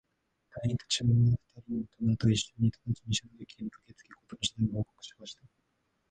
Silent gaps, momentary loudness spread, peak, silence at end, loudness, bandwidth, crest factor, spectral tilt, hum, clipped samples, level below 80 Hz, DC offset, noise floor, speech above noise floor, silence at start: none; 21 LU; -16 dBFS; 0.8 s; -31 LUFS; 9.6 kHz; 16 dB; -5.5 dB/octave; none; under 0.1%; -56 dBFS; under 0.1%; -77 dBFS; 46 dB; 0.55 s